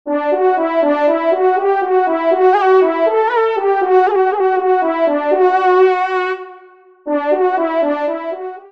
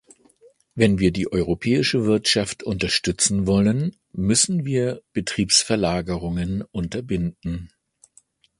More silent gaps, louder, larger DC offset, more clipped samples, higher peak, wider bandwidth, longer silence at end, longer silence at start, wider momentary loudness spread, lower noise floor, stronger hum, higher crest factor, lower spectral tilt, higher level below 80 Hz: neither; first, -14 LUFS vs -21 LUFS; first, 0.2% vs under 0.1%; neither; about the same, -2 dBFS vs -2 dBFS; second, 6 kHz vs 11.5 kHz; second, 0.05 s vs 0.95 s; second, 0.05 s vs 0.75 s; about the same, 8 LU vs 10 LU; second, -43 dBFS vs -58 dBFS; neither; second, 12 dB vs 20 dB; about the same, -4.5 dB/octave vs -4 dB/octave; second, -70 dBFS vs -42 dBFS